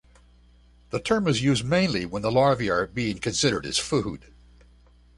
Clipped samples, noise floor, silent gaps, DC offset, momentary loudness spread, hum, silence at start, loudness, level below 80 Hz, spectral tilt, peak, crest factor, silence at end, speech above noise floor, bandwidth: under 0.1%; -55 dBFS; none; under 0.1%; 8 LU; 60 Hz at -45 dBFS; 0.95 s; -24 LUFS; -50 dBFS; -4.5 dB/octave; -8 dBFS; 18 dB; 1 s; 31 dB; 11.5 kHz